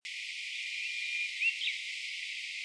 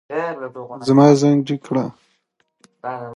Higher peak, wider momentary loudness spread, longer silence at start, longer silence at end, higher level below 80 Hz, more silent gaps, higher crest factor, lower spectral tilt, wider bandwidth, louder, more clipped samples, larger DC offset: second, -20 dBFS vs 0 dBFS; second, 7 LU vs 18 LU; about the same, 0.05 s vs 0.1 s; about the same, 0 s vs 0 s; second, under -90 dBFS vs -66 dBFS; neither; about the same, 18 dB vs 18 dB; second, 8.5 dB/octave vs -7 dB/octave; about the same, 11 kHz vs 11 kHz; second, -34 LUFS vs -17 LUFS; neither; neither